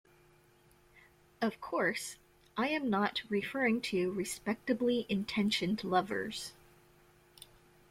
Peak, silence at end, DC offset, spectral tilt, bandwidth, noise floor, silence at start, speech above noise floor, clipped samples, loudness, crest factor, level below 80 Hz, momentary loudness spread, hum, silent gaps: -16 dBFS; 1.4 s; under 0.1%; -4.5 dB/octave; 16 kHz; -65 dBFS; 1.4 s; 32 dB; under 0.1%; -34 LUFS; 20 dB; -68 dBFS; 9 LU; none; none